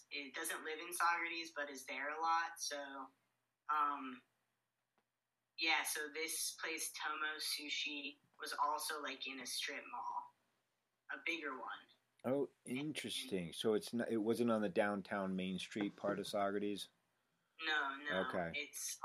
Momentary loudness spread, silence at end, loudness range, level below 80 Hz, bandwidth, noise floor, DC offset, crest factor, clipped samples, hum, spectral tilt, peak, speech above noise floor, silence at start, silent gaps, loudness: 11 LU; 0 s; 5 LU; -86 dBFS; 15 kHz; under -90 dBFS; under 0.1%; 20 dB; under 0.1%; none; -3 dB/octave; -22 dBFS; over 49 dB; 0.1 s; none; -41 LUFS